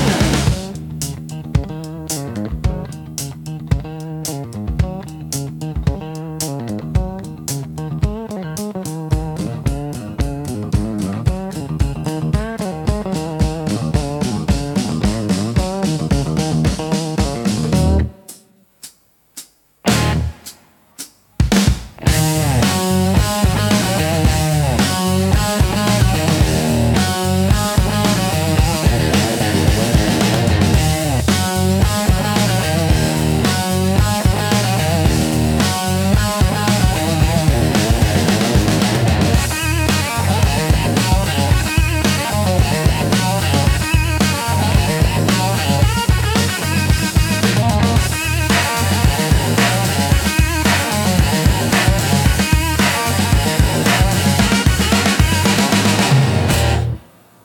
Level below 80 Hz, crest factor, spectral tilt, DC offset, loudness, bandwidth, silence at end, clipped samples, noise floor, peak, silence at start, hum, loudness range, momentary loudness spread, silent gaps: -24 dBFS; 14 dB; -5 dB/octave; under 0.1%; -16 LUFS; 17.5 kHz; 0.45 s; under 0.1%; -50 dBFS; 0 dBFS; 0 s; none; 9 LU; 10 LU; none